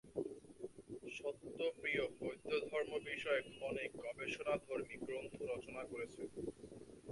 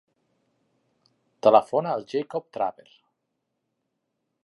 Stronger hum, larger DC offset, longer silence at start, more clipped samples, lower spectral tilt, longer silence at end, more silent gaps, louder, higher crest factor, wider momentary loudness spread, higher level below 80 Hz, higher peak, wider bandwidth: neither; neither; second, 0.05 s vs 1.45 s; neither; second, -4.5 dB/octave vs -6.5 dB/octave; second, 0 s vs 1.75 s; neither; second, -44 LUFS vs -24 LUFS; second, 18 dB vs 26 dB; about the same, 13 LU vs 11 LU; first, -72 dBFS vs -78 dBFS; second, -26 dBFS vs -2 dBFS; about the same, 11.5 kHz vs 11.5 kHz